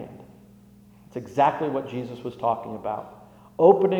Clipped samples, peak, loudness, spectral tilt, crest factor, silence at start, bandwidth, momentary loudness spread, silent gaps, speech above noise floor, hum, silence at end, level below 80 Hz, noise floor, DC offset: under 0.1%; -4 dBFS; -24 LUFS; -8 dB/octave; 22 dB; 0 s; 7.8 kHz; 21 LU; none; 29 dB; 60 Hz at -55 dBFS; 0 s; -64 dBFS; -51 dBFS; under 0.1%